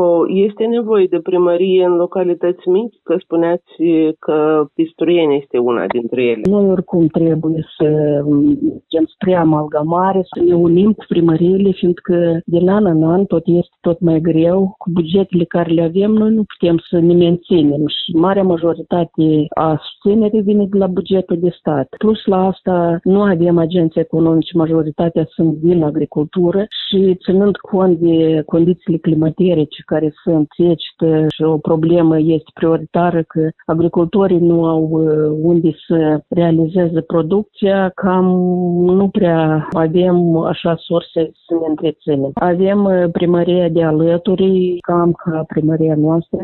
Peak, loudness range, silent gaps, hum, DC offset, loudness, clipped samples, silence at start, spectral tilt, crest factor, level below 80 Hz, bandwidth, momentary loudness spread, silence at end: 0 dBFS; 2 LU; none; none; under 0.1%; -14 LUFS; under 0.1%; 0 s; -11 dB/octave; 12 dB; -48 dBFS; 4.2 kHz; 5 LU; 0 s